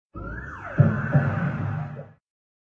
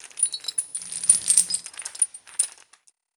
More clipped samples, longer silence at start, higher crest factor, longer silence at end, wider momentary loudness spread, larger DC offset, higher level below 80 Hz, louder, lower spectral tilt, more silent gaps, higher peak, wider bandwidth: neither; about the same, 0.15 s vs 0.05 s; about the same, 22 dB vs 26 dB; about the same, 0.7 s vs 0.65 s; first, 15 LU vs 11 LU; neither; first, -46 dBFS vs -76 dBFS; second, -25 LUFS vs -22 LUFS; first, -10.5 dB/octave vs 3 dB/octave; neither; second, -4 dBFS vs 0 dBFS; second, 3.7 kHz vs 19.5 kHz